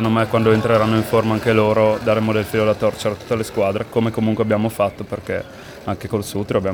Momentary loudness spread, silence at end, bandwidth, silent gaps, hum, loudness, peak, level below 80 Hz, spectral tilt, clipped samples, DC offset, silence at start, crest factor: 10 LU; 0 s; 20 kHz; none; none; -19 LUFS; -2 dBFS; -46 dBFS; -6.5 dB/octave; under 0.1%; under 0.1%; 0 s; 16 dB